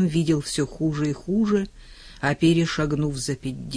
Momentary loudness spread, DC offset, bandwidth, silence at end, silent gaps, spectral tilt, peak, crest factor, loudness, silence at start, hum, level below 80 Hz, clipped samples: 8 LU; under 0.1%; 11 kHz; 0 s; none; -6 dB/octave; -8 dBFS; 16 dB; -24 LUFS; 0 s; none; -44 dBFS; under 0.1%